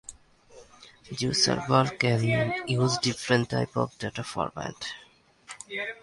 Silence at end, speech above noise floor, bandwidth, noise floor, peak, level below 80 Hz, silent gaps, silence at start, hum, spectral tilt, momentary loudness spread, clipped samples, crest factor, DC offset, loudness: 0.1 s; 26 dB; 11.5 kHz; -53 dBFS; -8 dBFS; -58 dBFS; none; 0.1 s; none; -4.5 dB/octave; 15 LU; under 0.1%; 22 dB; under 0.1%; -27 LUFS